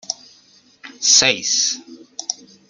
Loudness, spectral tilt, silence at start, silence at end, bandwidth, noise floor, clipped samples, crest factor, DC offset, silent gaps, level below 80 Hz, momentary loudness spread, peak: -15 LUFS; 1 dB/octave; 0.1 s; 0.35 s; 12 kHz; -52 dBFS; under 0.1%; 22 dB; under 0.1%; none; -64 dBFS; 18 LU; 0 dBFS